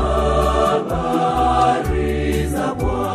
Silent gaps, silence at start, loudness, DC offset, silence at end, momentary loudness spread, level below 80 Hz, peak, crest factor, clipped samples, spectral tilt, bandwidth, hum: none; 0 s; -18 LUFS; under 0.1%; 0 s; 5 LU; -26 dBFS; -4 dBFS; 14 dB; under 0.1%; -6.5 dB/octave; 15 kHz; none